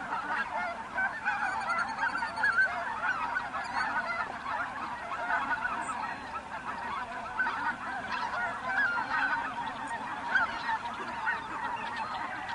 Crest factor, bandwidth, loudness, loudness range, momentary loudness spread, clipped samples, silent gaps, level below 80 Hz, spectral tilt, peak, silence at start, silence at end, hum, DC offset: 18 dB; 11.5 kHz; -32 LUFS; 3 LU; 8 LU; under 0.1%; none; -62 dBFS; -3 dB/octave; -16 dBFS; 0 s; 0 s; none; under 0.1%